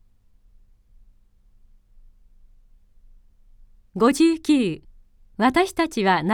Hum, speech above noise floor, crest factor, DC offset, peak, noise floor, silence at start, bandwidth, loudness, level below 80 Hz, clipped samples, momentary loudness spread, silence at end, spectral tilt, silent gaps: none; 36 dB; 18 dB; under 0.1%; -6 dBFS; -56 dBFS; 3.95 s; 15 kHz; -20 LUFS; -52 dBFS; under 0.1%; 18 LU; 0 s; -5 dB/octave; none